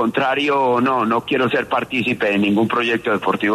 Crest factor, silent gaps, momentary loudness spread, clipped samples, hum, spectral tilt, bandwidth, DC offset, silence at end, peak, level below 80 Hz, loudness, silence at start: 14 dB; none; 3 LU; under 0.1%; none; -6 dB/octave; 13.5 kHz; under 0.1%; 0 s; -4 dBFS; -58 dBFS; -18 LUFS; 0 s